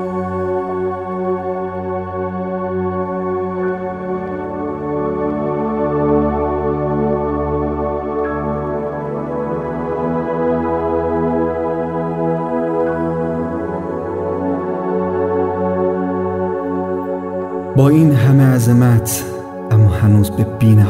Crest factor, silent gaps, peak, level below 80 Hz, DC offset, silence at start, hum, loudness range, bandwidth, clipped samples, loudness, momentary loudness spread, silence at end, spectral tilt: 16 dB; none; 0 dBFS; -38 dBFS; under 0.1%; 0 s; none; 7 LU; 16 kHz; under 0.1%; -17 LUFS; 11 LU; 0 s; -8 dB/octave